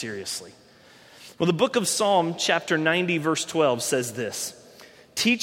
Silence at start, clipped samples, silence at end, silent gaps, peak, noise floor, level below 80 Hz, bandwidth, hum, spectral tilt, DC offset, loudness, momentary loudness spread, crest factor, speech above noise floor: 0 s; under 0.1%; 0 s; none; -6 dBFS; -52 dBFS; -68 dBFS; 16.5 kHz; none; -3.5 dB/octave; under 0.1%; -24 LUFS; 10 LU; 20 dB; 28 dB